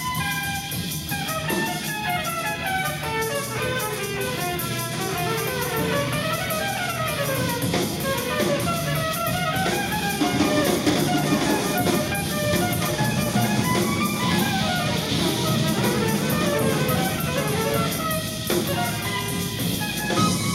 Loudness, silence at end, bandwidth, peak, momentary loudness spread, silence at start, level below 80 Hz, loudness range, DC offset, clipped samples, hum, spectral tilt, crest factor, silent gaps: -23 LUFS; 0 s; 16 kHz; -8 dBFS; 4 LU; 0 s; -46 dBFS; 3 LU; under 0.1%; under 0.1%; none; -4 dB/octave; 16 dB; none